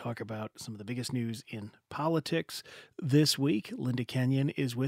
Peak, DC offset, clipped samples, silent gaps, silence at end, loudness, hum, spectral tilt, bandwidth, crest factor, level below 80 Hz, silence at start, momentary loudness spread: -14 dBFS; under 0.1%; under 0.1%; none; 0 s; -32 LUFS; none; -5.5 dB/octave; 16 kHz; 18 dB; -72 dBFS; 0 s; 16 LU